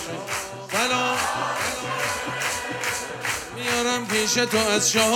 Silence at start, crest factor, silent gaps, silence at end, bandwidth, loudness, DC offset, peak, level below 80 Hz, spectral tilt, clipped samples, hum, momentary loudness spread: 0 s; 18 dB; none; 0 s; 18 kHz; -23 LUFS; under 0.1%; -6 dBFS; -56 dBFS; -2 dB/octave; under 0.1%; none; 8 LU